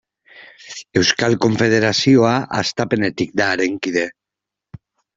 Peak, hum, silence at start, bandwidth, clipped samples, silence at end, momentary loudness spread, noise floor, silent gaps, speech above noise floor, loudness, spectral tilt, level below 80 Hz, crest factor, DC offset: 0 dBFS; none; 0.35 s; 7.8 kHz; under 0.1%; 1.05 s; 9 LU; -85 dBFS; none; 68 dB; -17 LUFS; -4.5 dB/octave; -54 dBFS; 18 dB; under 0.1%